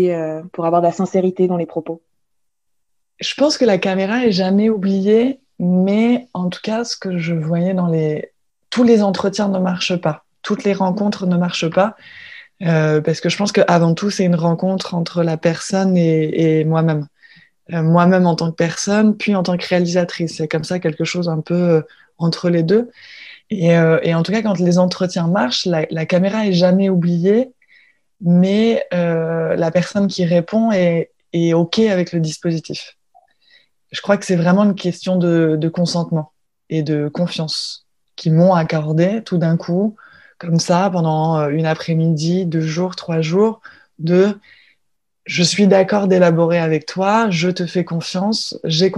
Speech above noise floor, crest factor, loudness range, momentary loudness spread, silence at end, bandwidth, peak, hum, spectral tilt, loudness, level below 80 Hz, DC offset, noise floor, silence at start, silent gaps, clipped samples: 59 dB; 16 dB; 3 LU; 10 LU; 0 s; 10.5 kHz; 0 dBFS; none; -6.5 dB/octave; -17 LUFS; -60 dBFS; under 0.1%; -75 dBFS; 0 s; none; under 0.1%